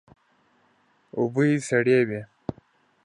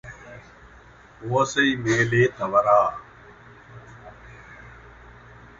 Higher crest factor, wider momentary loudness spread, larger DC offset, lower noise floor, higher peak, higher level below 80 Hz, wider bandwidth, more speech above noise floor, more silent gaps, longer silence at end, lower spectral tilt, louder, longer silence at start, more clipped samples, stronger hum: about the same, 18 dB vs 20 dB; second, 17 LU vs 26 LU; neither; first, -64 dBFS vs -49 dBFS; second, -8 dBFS vs -4 dBFS; second, -62 dBFS vs -54 dBFS; first, 11 kHz vs 8 kHz; first, 42 dB vs 29 dB; neither; about the same, 0.8 s vs 0.85 s; first, -6.5 dB/octave vs -5 dB/octave; about the same, -23 LUFS vs -21 LUFS; first, 1.15 s vs 0.05 s; neither; neither